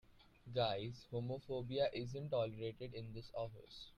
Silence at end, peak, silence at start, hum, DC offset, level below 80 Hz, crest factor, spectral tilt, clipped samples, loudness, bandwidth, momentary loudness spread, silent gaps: 0 s; -24 dBFS; 0.1 s; none; under 0.1%; -66 dBFS; 18 dB; -7 dB/octave; under 0.1%; -43 LUFS; 9.8 kHz; 10 LU; none